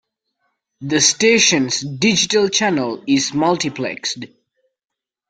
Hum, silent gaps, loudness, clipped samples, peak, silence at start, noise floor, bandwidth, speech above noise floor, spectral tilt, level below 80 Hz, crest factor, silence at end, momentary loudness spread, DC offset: none; none; -16 LUFS; under 0.1%; -2 dBFS; 0.8 s; -71 dBFS; 10.5 kHz; 54 dB; -2.5 dB/octave; -58 dBFS; 18 dB; 1.05 s; 12 LU; under 0.1%